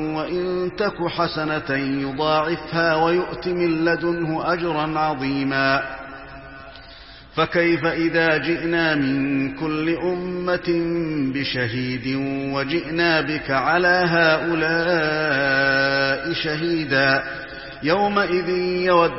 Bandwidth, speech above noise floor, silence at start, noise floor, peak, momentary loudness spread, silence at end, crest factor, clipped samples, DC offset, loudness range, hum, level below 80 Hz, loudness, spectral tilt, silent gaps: 5.8 kHz; 22 dB; 0 s; -42 dBFS; -2 dBFS; 7 LU; 0 s; 18 dB; under 0.1%; 0.2%; 5 LU; none; -48 dBFS; -21 LUFS; -9 dB/octave; none